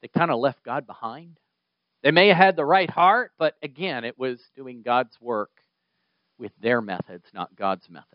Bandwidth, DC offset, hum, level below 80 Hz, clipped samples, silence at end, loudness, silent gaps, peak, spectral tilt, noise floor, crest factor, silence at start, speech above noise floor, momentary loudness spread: 5.4 kHz; under 0.1%; none; -76 dBFS; under 0.1%; 0.15 s; -22 LUFS; none; 0 dBFS; -2.5 dB/octave; -79 dBFS; 24 dB; 0.05 s; 56 dB; 19 LU